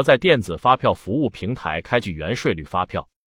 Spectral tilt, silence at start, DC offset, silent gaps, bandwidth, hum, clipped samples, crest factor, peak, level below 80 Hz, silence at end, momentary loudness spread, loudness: -6 dB/octave; 0 s; under 0.1%; none; 16 kHz; none; under 0.1%; 18 dB; -2 dBFS; -48 dBFS; 0.35 s; 9 LU; -21 LUFS